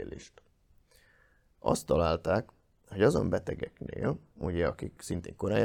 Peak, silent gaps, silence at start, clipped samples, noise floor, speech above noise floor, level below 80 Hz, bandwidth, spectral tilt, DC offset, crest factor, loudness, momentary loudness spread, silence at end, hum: -10 dBFS; none; 0 s; under 0.1%; -66 dBFS; 35 dB; -52 dBFS; 18.5 kHz; -6.5 dB/octave; under 0.1%; 22 dB; -31 LUFS; 14 LU; 0 s; none